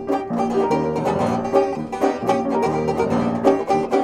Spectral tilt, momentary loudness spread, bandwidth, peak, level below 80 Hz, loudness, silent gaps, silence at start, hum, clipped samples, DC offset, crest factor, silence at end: -7 dB/octave; 3 LU; 13 kHz; -2 dBFS; -48 dBFS; -20 LUFS; none; 0 s; none; under 0.1%; under 0.1%; 16 dB; 0 s